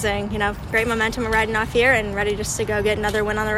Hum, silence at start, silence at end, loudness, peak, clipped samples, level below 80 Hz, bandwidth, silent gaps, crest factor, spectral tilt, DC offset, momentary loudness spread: none; 0 s; 0 s; -20 LUFS; -4 dBFS; under 0.1%; -36 dBFS; 16 kHz; none; 16 dB; -4 dB/octave; under 0.1%; 6 LU